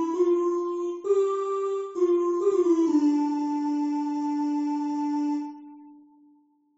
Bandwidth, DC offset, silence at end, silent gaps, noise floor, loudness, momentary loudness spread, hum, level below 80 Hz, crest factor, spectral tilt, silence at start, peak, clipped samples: 8 kHz; under 0.1%; 0.8 s; none; -61 dBFS; -26 LUFS; 7 LU; none; -78 dBFS; 14 dB; -4.5 dB/octave; 0 s; -12 dBFS; under 0.1%